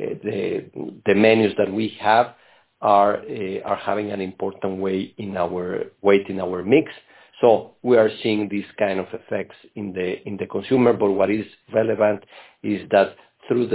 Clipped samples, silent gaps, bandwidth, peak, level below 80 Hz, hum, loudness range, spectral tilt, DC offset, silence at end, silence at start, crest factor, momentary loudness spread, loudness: under 0.1%; none; 4 kHz; -2 dBFS; -58 dBFS; none; 4 LU; -10 dB/octave; under 0.1%; 0 s; 0 s; 20 dB; 11 LU; -21 LUFS